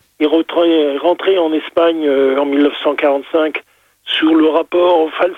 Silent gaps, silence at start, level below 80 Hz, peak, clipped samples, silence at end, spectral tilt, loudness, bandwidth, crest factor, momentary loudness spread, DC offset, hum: none; 0.2 s; -64 dBFS; -2 dBFS; under 0.1%; 0 s; -5 dB/octave; -14 LUFS; 4.3 kHz; 12 dB; 4 LU; under 0.1%; none